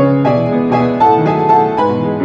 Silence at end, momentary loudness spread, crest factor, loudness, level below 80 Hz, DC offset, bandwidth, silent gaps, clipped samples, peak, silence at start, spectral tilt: 0 s; 3 LU; 12 dB; -12 LUFS; -46 dBFS; under 0.1%; 7.4 kHz; none; under 0.1%; 0 dBFS; 0 s; -9 dB/octave